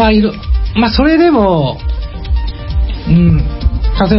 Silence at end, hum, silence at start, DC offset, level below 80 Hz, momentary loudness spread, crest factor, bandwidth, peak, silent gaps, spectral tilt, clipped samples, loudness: 0 s; none; 0 s; under 0.1%; -16 dBFS; 10 LU; 10 dB; 5.8 kHz; 0 dBFS; none; -11 dB/octave; under 0.1%; -13 LUFS